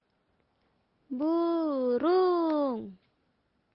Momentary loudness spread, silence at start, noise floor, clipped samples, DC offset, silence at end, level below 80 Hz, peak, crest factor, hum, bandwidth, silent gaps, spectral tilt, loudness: 14 LU; 1.1 s; -74 dBFS; under 0.1%; under 0.1%; 0.8 s; -76 dBFS; -18 dBFS; 14 dB; none; 5.6 kHz; none; -9.5 dB/octave; -28 LUFS